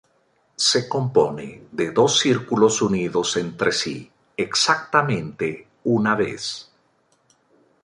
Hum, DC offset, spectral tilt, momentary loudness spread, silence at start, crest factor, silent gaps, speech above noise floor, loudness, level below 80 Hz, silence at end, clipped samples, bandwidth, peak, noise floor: none; under 0.1%; -3.5 dB/octave; 11 LU; 0.6 s; 20 dB; none; 43 dB; -21 LUFS; -60 dBFS; 1.2 s; under 0.1%; 11.5 kHz; -2 dBFS; -64 dBFS